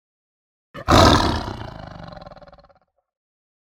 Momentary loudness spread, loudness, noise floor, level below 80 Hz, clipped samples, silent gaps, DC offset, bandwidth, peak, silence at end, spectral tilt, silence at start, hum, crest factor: 25 LU; -16 LUFS; -58 dBFS; -34 dBFS; under 0.1%; none; under 0.1%; 18 kHz; 0 dBFS; 1.6 s; -5 dB/octave; 0.75 s; none; 22 dB